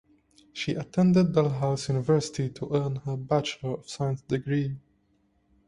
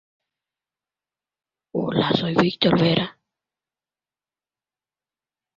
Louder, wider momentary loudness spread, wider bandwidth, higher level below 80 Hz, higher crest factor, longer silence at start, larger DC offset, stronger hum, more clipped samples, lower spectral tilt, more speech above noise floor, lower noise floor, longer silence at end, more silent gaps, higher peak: second, -27 LUFS vs -21 LUFS; about the same, 12 LU vs 11 LU; first, 11 kHz vs 7.4 kHz; about the same, -58 dBFS vs -58 dBFS; about the same, 18 dB vs 22 dB; second, 0.55 s vs 1.75 s; neither; second, none vs 50 Hz at -55 dBFS; neither; about the same, -6.5 dB/octave vs -7.5 dB/octave; second, 42 dB vs over 71 dB; second, -68 dBFS vs under -90 dBFS; second, 0.9 s vs 2.45 s; neither; second, -8 dBFS vs -4 dBFS